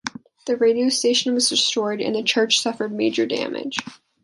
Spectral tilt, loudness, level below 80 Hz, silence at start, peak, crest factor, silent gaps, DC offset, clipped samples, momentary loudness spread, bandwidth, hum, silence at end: -2 dB/octave; -20 LUFS; -70 dBFS; 0.05 s; -4 dBFS; 16 dB; none; under 0.1%; under 0.1%; 10 LU; 11.5 kHz; none; 0.3 s